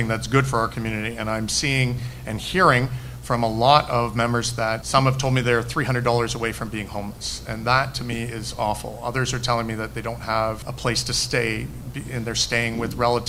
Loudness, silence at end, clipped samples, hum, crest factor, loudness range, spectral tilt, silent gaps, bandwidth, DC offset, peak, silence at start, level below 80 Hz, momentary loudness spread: -23 LUFS; 0 s; under 0.1%; none; 22 dB; 5 LU; -4.5 dB/octave; none; 16 kHz; under 0.1%; 0 dBFS; 0 s; -40 dBFS; 11 LU